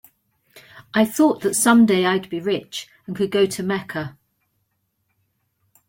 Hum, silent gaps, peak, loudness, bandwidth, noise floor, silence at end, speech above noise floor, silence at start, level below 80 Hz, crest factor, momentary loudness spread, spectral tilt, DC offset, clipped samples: none; none; -4 dBFS; -19 LUFS; 17 kHz; -72 dBFS; 1.75 s; 52 dB; 0.55 s; -62 dBFS; 18 dB; 17 LU; -4 dB/octave; under 0.1%; under 0.1%